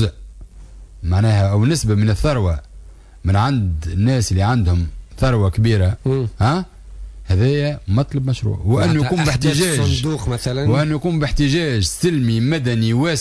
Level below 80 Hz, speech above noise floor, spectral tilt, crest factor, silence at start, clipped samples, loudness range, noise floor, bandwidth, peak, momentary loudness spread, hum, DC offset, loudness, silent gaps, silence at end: -30 dBFS; 23 dB; -6 dB/octave; 12 dB; 0 s; under 0.1%; 1 LU; -39 dBFS; 11 kHz; -6 dBFS; 6 LU; none; under 0.1%; -18 LUFS; none; 0 s